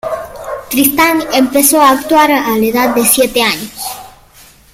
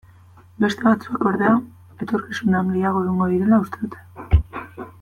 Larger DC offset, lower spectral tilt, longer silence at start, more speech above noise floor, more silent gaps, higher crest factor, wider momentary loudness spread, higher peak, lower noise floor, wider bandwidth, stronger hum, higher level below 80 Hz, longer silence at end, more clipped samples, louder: neither; second, -2 dB/octave vs -8 dB/octave; second, 0.05 s vs 0.6 s; about the same, 31 dB vs 28 dB; neither; second, 12 dB vs 18 dB; about the same, 14 LU vs 15 LU; first, 0 dBFS vs -4 dBFS; second, -42 dBFS vs -48 dBFS; first, over 20 kHz vs 12.5 kHz; neither; second, -44 dBFS vs -32 dBFS; first, 0.65 s vs 0.1 s; neither; first, -10 LUFS vs -20 LUFS